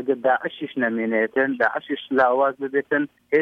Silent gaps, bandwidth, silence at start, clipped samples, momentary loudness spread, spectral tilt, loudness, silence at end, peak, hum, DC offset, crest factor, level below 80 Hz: none; 5.4 kHz; 0 s; under 0.1%; 6 LU; -7 dB/octave; -22 LUFS; 0 s; -6 dBFS; none; under 0.1%; 16 dB; -70 dBFS